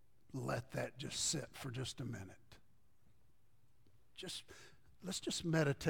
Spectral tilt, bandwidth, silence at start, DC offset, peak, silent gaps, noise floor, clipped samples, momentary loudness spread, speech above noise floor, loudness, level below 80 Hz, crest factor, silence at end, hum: -4 dB/octave; 17.5 kHz; 0.35 s; under 0.1%; -22 dBFS; none; -75 dBFS; under 0.1%; 16 LU; 34 dB; -42 LUFS; -68 dBFS; 20 dB; 0 s; none